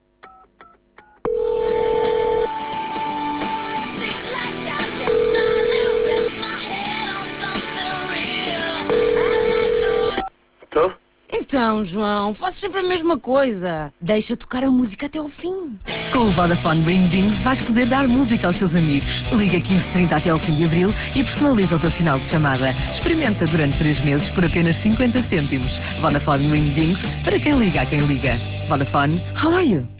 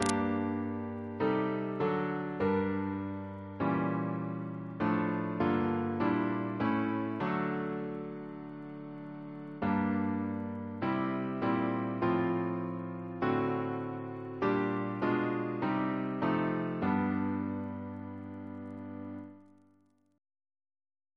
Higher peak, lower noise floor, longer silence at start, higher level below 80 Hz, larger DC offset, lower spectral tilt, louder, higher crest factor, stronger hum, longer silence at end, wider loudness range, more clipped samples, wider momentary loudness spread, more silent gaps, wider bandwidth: first, -6 dBFS vs -10 dBFS; second, -51 dBFS vs -69 dBFS; first, 0.25 s vs 0 s; first, -36 dBFS vs -66 dBFS; neither; first, -10.5 dB/octave vs -7 dB/octave; first, -20 LUFS vs -34 LUFS; second, 14 dB vs 24 dB; neither; second, 0 s vs 1.7 s; about the same, 4 LU vs 4 LU; neither; second, 8 LU vs 13 LU; neither; second, 4 kHz vs 11 kHz